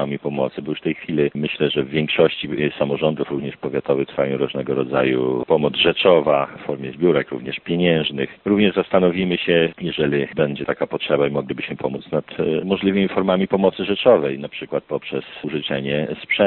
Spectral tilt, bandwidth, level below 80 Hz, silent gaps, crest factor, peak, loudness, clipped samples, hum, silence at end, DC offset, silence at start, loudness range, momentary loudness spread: -4 dB/octave; 4.3 kHz; -54 dBFS; none; 18 dB; -2 dBFS; -20 LUFS; under 0.1%; none; 0 s; under 0.1%; 0 s; 3 LU; 10 LU